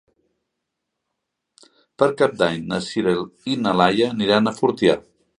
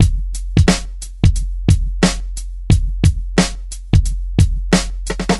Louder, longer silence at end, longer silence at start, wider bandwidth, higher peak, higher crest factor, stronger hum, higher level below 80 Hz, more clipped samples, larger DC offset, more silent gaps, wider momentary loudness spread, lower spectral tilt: second, -20 LUFS vs -17 LUFS; first, 0.4 s vs 0 s; first, 2 s vs 0 s; about the same, 11 kHz vs 12 kHz; about the same, 0 dBFS vs 0 dBFS; first, 22 dB vs 16 dB; neither; second, -58 dBFS vs -20 dBFS; neither; second, under 0.1% vs 0.1%; neither; second, 7 LU vs 10 LU; about the same, -5.5 dB/octave vs -5.5 dB/octave